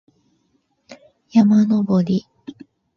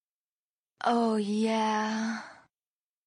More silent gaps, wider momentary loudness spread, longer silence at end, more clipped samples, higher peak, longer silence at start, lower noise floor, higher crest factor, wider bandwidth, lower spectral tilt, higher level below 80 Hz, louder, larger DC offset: neither; first, 25 LU vs 9 LU; second, 0.45 s vs 0.75 s; neither; first, -2 dBFS vs -14 dBFS; about the same, 0.9 s vs 0.8 s; second, -66 dBFS vs under -90 dBFS; about the same, 18 dB vs 16 dB; second, 6.8 kHz vs 10.5 kHz; first, -8.5 dB/octave vs -5 dB/octave; first, -60 dBFS vs -82 dBFS; first, -17 LUFS vs -29 LUFS; neither